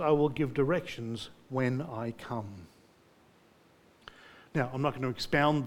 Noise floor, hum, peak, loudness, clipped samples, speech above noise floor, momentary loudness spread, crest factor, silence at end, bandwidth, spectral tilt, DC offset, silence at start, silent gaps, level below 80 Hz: -62 dBFS; none; -12 dBFS; -32 LUFS; under 0.1%; 32 dB; 24 LU; 20 dB; 0 s; 17.5 kHz; -6.5 dB/octave; under 0.1%; 0 s; none; -60 dBFS